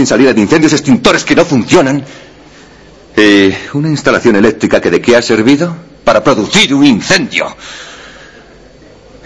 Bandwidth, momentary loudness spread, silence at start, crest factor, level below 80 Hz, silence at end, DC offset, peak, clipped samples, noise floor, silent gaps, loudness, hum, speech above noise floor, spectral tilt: 11 kHz; 10 LU; 0 s; 10 dB; -40 dBFS; 1.15 s; under 0.1%; 0 dBFS; 1%; -37 dBFS; none; -9 LUFS; none; 29 dB; -4.5 dB/octave